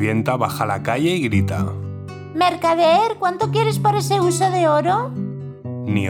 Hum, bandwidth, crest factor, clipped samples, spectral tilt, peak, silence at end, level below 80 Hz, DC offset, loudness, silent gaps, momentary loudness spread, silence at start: none; 18 kHz; 16 dB; under 0.1%; -6 dB/octave; -4 dBFS; 0 s; -58 dBFS; under 0.1%; -19 LUFS; none; 13 LU; 0 s